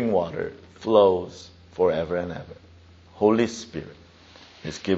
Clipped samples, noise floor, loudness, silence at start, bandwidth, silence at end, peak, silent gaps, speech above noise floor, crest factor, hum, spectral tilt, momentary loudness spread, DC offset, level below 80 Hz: under 0.1%; -50 dBFS; -24 LUFS; 0 s; 8 kHz; 0 s; -4 dBFS; none; 27 dB; 20 dB; none; -5 dB/octave; 21 LU; under 0.1%; -56 dBFS